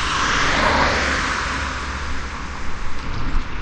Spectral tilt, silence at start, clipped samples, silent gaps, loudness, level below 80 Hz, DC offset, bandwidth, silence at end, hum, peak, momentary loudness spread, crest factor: -3.5 dB/octave; 0 s; under 0.1%; none; -21 LUFS; -26 dBFS; under 0.1%; 9.8 kHz; 0 s; none; -4 dBFS; 13 LU; 16 dB